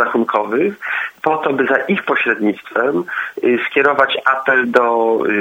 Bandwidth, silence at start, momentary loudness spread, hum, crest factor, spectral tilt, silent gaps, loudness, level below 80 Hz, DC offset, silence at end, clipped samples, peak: 16.5 kHz; 0 s; 5 LU; none; 16 dB; -6 dB/octave; none; -16 LUFS; -64 dBFS; under 0.1%; 0 s; under 0.1%; 0 dBFS